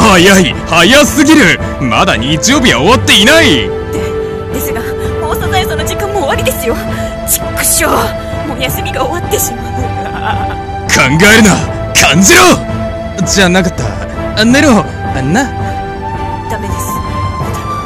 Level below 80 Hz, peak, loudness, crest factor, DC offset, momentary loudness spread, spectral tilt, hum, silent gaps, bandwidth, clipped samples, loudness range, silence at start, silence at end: -26 dBFS; 0 dBFS; -9 LUFS; 10 dB; under 0.1%; 13 LU; -3.5 dB/octave; none; none; over 20 kHz; 1%; 7 LU; 0 s; 0 s